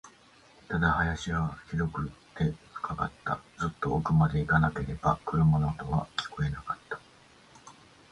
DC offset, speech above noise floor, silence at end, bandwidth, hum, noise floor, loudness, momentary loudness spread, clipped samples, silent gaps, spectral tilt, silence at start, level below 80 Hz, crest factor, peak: under 0.1%; 29 dB; 0.4 s; 8.6 kHz; none; -58 dBFS; -30 LUFS; 12 LU; under 0.1%; none; -7 dB/octave; 0.05 s; -44 dBFS; 20 dB; -10 dBFS